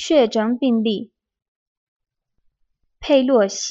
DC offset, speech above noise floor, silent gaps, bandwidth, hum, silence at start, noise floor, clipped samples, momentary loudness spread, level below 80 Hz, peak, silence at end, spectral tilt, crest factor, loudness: under 0.1%; 51 dB; 1.48-2.00 s; 8 kHz; none; 0 s; -68 dBFS; under 0.1%; 10 LU; -56 dBFS; -4 dBFS; 0 s; -4 dB/octave; 18 dB; -18 LUFS